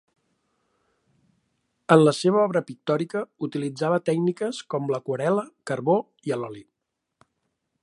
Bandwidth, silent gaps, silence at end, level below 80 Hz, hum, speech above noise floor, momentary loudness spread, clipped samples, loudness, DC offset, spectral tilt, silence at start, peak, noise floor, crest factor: 11.5 kHz; none; 1.2 s; -74 dBFS; none; 53 dB; 12 LU; under 0.1%; -24 LUFS; under 0.1%; -6.5 dB/octave; 1.9 s; -2 dBFS; -77 dBFS; 24 dB